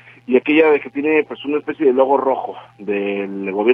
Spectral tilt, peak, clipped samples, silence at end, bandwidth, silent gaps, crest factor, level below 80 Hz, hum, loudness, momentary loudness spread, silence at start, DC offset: -8 dB/octave; 0 dBFS; under 0.1%; 0 s; 3.8 kHz; none; 16 dB; -66 dBFS; none; -17 LUFS; 10 LU; 0.3 s; under 0.1%